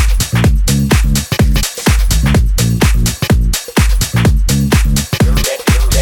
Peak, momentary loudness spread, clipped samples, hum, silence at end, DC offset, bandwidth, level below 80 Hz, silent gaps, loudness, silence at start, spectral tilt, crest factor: 0 dBFS; 2 LU; under 0.1%; none; 0 s; under 0.1%; 18 kHz; -14 dBFS; none; -13 LUFS; 0 s; -4.5 dB/octave; 10 dB